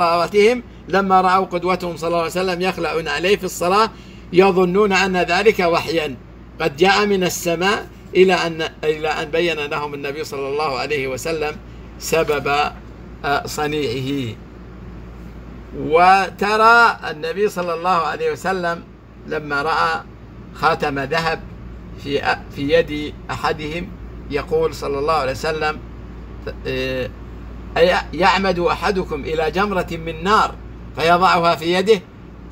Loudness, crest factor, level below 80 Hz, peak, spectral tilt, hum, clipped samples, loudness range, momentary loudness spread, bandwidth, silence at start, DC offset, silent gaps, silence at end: -18 LUFS; 18 dB; -38 dBFS; 0 dBFS; -4.5 dB/octave; none; under 0.1%; 6 LU; 19 LU; 16 kHz; 0 s; under 0.1%; none; 0 s